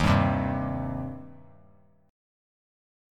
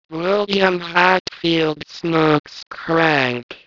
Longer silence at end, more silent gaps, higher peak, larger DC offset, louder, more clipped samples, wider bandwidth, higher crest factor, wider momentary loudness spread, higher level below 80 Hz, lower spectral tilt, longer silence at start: first, 1.75 s vs 0.1 s; second, none vs 1.20-1.25 s, 2.40-2.44 s, 3.43-3.49 s; second, -8 dBFS vs 0 dBFS; neither; second, -28 LUFS vs -17 LUFS; neither; first, 12 kHz vs 6 kHz; about the same, 22 dB vs 18 dB; first, 20 LU vs 7 LU; first, -42 dBFS vs -58 dBFS; first, -7.5 dB/octave vs -5.5 dB/octave; about the same, 0 s vs 0.1 s